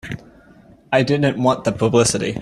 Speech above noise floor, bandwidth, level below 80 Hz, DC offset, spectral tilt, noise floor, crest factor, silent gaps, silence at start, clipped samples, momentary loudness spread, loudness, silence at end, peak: 31 dB; 13.5 kHz; -48 dBFS; under 0.1%; -5 dB/octave; -48 dBFS; 16 dB; none; 0.05 s; under 0.1%; 10 LU; -18 LUFS; 0 s; -2 dBFS